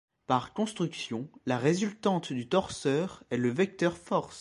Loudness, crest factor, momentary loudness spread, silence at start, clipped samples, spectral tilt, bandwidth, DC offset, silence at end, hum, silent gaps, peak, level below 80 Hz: -31 LUFS; 20 dB; 6 LU; 0.3 s; under 0.1%; -5.5 dB/octave; 11.5 kHz; under 0.1%; 0 s; none; none; -12 dBFS; -64 dBFS